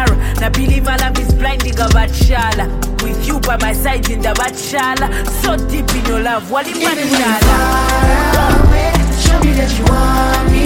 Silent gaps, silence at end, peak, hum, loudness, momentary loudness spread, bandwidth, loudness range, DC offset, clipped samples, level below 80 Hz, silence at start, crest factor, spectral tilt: none; 0 s; 0 dBFS; none; -14 LUFS; 5 LU; 17 kHz; 4 LU; under 0.1%; under 0.1%; -16 dBFS; 0 s; 12 dB; -4.5 dB/octave